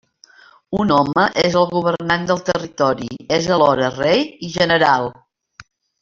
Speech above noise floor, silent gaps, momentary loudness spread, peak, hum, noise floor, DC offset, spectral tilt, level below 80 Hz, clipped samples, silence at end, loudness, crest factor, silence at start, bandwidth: 32 dB; none; 7 LU; 0 dBFS; none; -49 dBFS; under 0.1%; -5 dB/octave; -50 dBFS; under 0.1%; 0.4 s; -17 LUFS; 18 dB; 0.7 s; 7.6 kHz